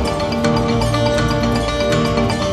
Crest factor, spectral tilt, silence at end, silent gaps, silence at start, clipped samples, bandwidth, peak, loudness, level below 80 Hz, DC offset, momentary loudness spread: 14 dB; -5.5 dB/octave; 0 s; none; 0 s; under 0.1%; 14 kHz; -2 dBFS; -17 LUFS; -28 dBFS; under 0.1%; 2 LU